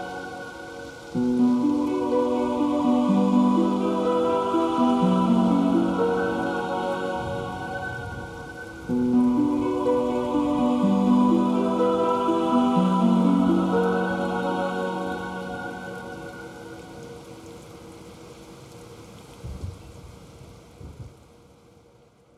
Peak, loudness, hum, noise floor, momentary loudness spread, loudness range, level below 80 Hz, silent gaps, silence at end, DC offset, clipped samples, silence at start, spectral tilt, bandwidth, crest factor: -8 dBFS; -23 LUFS; none; -56 dBFS; 23 LU; 21 LU; -52 dBFS; none; 1.3 s; under 0.1%; under 0.1%; 0 s; -7.5 dB/octave; 12 kHz; 16 dB